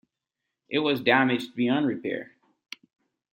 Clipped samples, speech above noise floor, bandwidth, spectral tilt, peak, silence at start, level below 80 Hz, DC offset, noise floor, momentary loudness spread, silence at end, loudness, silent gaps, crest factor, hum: under 0.1%; 60 dB; 16.5 kHz; -6 dB/octave; -6 dBFS; 0.7 s; -72 dBFS; under 0.1%; -85 dBFS; 23 LU; 1.1 s; -25 LUFS; none; 22 dB; none